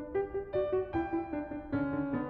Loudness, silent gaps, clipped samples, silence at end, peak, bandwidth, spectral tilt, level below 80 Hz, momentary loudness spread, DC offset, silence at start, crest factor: -35 LUFS; none; under 0.1%; 0 s; -22 dBFS; 4.5 kHz; -10.5 dB/octave; -54 dBFS; 5 LU; under 0.1%; 0 s; 12 dB